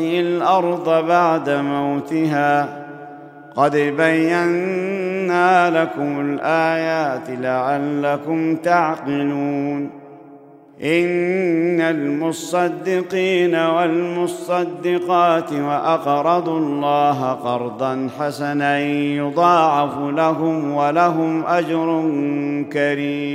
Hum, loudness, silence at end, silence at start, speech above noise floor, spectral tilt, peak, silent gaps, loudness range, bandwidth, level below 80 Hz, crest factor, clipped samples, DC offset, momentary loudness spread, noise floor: none; -18 LUFS; 0 s; 0 s; 25 dB; -6.5 dB/octave; -2 dBFS; none; 3 LU; 14.5 kHz; -70 dBFS; 16 dB; under 0.1%; under 0.1%; 7 LU; -43 dBFS